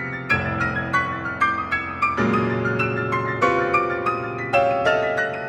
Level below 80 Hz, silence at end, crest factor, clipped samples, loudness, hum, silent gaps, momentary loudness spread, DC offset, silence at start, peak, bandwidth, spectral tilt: -48 dBFS; 0 s; 18 dB; under 0.1%; -21 LUFS; none; none; 4 LU; under 0.1%; 0 s; -4 dBFS; 12 kHz; -6.5 dB/octave